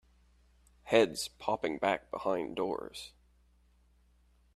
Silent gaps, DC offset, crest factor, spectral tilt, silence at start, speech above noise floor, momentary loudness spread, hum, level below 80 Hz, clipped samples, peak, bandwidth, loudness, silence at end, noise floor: none; under 0.1%; 24 dB; -4 dB/octave; 0.85 s; 34 dB; 15 LU; none; -64 dBFS; under 0.1%; -10 dBFS; 14 kHz; -33 LUFS; 1.45 s; -67 dBFS